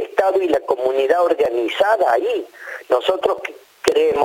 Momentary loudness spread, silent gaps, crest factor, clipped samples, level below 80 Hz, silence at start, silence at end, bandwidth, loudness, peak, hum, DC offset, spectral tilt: 10 LU; none; 18 dB; under 0.1%; -58 dBFS; 0 s; 0 s; 17 kHz; -18 LUFS; 0 dBFS; none; under 0.1%; -3.5 dB/octave